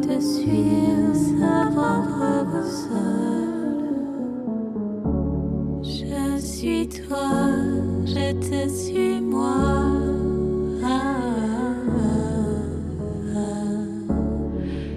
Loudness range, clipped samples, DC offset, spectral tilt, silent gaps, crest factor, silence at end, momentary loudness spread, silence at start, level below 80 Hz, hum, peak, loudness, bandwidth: 4 LU; under 0.1%; under 0.1%; -6.5 dB/octave; none; 14 dB; 0 s; 8 LU; 0 s; -36 dBFS; none; -8 dBFS; -23 LUFS; 14 kHz